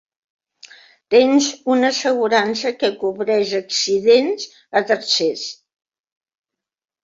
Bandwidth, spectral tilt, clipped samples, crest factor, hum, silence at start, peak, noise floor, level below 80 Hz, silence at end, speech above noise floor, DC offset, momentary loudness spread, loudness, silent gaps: 7.8 kHz; -2.5 dB/octave; under 0.1%; 18 dB; none; 1.1 s; -2 dBFS; -46 dBFS; -66 dBFS; 1.5 s; 28 dB; under 0.1%; 8 LU; -17 LUFS; none